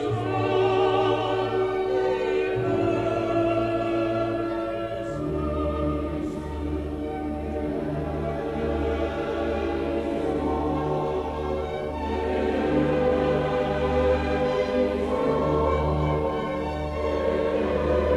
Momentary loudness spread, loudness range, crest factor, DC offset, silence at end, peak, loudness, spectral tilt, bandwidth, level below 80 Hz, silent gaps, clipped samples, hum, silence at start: 7 LU; 5 LU; 14 dB; under 0.1%; 0 s; -10 dBFS; -26 LUFS; -7.5 dB/octave; 11.5 kHz; -36 dBFS; none; under 0.1%; none; 0 s